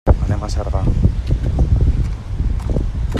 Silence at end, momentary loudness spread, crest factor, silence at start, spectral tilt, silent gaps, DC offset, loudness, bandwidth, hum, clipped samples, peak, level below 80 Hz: 0 s; 6 LU; 16 dB; 0.05 s; -8 dB/octave; none; under 0.1%; -19 LUFS; 9 kHz; none; under 0.1%; 0 dBFS; -18 dBFS